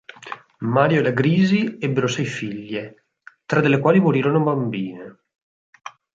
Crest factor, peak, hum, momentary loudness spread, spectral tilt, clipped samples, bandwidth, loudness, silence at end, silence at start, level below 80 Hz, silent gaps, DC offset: 18 dB; -2 dBFS; none; 20 LU; -7 dB/octave; under 0.1%; 7.6 kHz; -20 LUFS; 0.25 s; 0.25 s; -62 dBFS; 5.42-5.73 s; under 0.1%